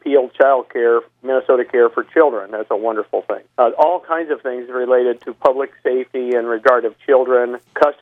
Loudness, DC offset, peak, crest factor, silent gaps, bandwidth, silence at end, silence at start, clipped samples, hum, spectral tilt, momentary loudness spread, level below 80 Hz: -17 LUFS; under 0.1%; 0 dBFS; 16 dB; none; 5.8 kHz; 0.1 s; 0.05 s; under 0.1%; none; -6 dB/octave; 8 LU; -68 dBFS